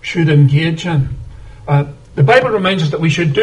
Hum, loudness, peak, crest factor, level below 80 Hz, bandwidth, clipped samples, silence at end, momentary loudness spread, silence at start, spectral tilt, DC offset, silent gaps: none; -13 LUFS; 0 dBFS; 14 dB; -38 dBFS; 9 kHz; under 0.1%; 0 s; 13 LU; 0.05 s; -7 dB/octave; 0.2%; none